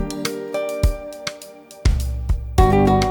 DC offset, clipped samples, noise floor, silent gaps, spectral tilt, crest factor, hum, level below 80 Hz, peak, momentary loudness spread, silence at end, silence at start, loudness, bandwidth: under 0.1%; under 0.1%; -40 dBFS; none; -6 dB/octave; 18 dB; none; -24 dBFS; -2 dBFS; 15 LU; 0 s; 0 s; -21 LUFS; over 20 kHz